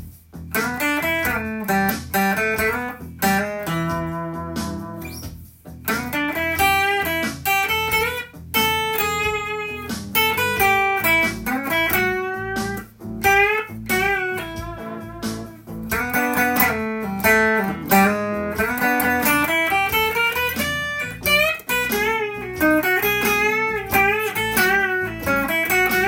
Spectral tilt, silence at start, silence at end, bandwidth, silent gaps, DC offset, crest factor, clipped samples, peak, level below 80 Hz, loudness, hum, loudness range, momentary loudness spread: -3.5 dB/octave; 0 s; 0 s; 17 kHz; none; under 0.1%; 20 dB; under 0.1%; 0 dBFS; -44 dBFS; -20 LUFS; none; 4 LU; 12 LU